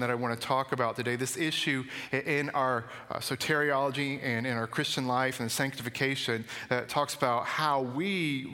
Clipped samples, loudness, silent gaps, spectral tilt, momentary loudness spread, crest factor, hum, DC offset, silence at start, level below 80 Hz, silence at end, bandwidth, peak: under 0.1%; -30 LUFS; none; -4 dB/octave; 5 LU; 20 dB; none; under 0.1%; 0 s; -70 dBFS; 0 s; 16.5 kHz; -10 dBFS